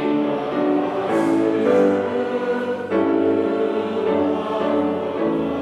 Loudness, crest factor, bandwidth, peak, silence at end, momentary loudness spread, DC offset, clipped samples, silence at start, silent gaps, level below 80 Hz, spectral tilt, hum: -20 LUFS; 14 dB; 11 kHz; -6 dBFS; 0 s; 5 LU; under 0.1%; under 0.1%; 0 s; none; -62 dBFS; -7 dB/octave; none